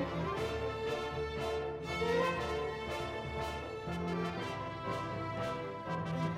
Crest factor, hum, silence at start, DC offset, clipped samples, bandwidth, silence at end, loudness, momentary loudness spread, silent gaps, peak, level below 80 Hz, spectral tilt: 16 dB; none; 0 s; under 0.1%; under 0.1%; 15.5 kHz; 0 s; -37 LUFS; 6 LU; none; -22 dBFS; -54 dBFS; -6 dB/octave